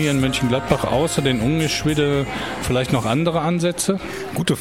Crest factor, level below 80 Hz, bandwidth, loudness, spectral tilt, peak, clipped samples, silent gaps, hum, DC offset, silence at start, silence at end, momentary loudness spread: 16 dB; -40 dBFS; 16.5 kHz; -20 LUFS; -5 dB/octave; -4 dBFS; under 0.1%; none; none; 0.2%; 0 s; 0 s; 5 LU